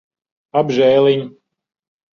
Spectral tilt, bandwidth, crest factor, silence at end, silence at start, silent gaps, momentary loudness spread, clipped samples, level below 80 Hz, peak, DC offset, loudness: -6.5 dB/octave; 6.8 kHz; 16 dB; 0.85 s; 0.55 s; none; 9 LU; under 0.1%; -62 dBFS; -2 dBFS; under 0.1%; -15 LUFS